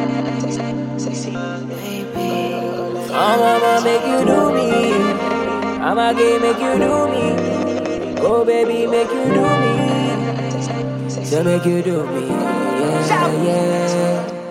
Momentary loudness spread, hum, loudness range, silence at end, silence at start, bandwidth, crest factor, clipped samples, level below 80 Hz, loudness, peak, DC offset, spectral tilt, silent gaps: 9 LU; none; 3 LU; 0 s; 0 s; 16.5 kHz; 14 dB; under 0.1%; -52 dBFS; -18 LUFS; -2 dBFS; under 0.1%; -6 dB/octave; none